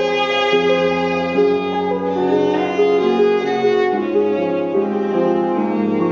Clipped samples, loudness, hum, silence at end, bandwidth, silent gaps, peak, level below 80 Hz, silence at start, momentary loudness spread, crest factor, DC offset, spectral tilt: under 0.1%; -17 LUFS; none; 0 s; 7 kHz; none; -4 dBFS; -62 dBFS; 0 s; 4 LU; 12 dB; under 0.1%; -4 dB/octave